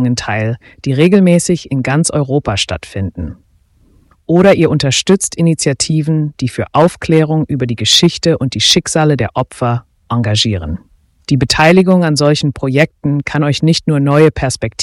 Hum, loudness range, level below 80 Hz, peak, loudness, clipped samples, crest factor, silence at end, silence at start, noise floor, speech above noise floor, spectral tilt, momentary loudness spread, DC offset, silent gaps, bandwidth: none; 2 LU; -38 dBFS; 0 dBFS; -12 LUFS; under 0.1%; 12 dB; 0 s; 0 s; -51 dBFS; 39 dB; -5 dB/octave; 11 LU; under 0.1%; none; 14.5 kHz